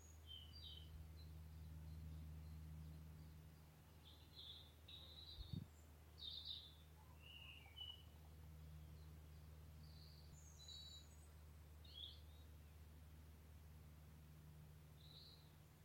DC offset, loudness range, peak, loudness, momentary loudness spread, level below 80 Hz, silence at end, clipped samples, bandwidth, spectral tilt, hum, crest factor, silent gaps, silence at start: under 0.1%; 5 LU; -38 dBFS; -60 LUFS; 9 LU; -64 dBFS; 0 s; under 0.1%; 16.5 kHz; -4.5 dB/octave; none; 22 dB; none; 0 s